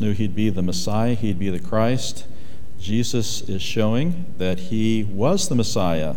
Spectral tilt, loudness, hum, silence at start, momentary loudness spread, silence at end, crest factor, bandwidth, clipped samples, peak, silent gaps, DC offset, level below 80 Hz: -5.5 dB/octave; -23 LUFS; none; 0 s; 6 LU; 0 s; 18 dB; 17 kHz; under 0.1%; -6 dBFS; none; 9%; -46 dBFS